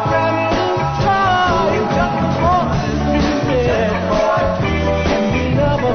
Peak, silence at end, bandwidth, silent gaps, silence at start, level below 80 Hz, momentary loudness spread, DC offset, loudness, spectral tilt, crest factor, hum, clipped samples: -4 dBFS; 0 s; 6.6 kHz; none; 0 s; -30 dBFS; 3 LU; under 0.1%; -16 LUFS; -6.5 dB/octave; 12 dB; none; under 0.1%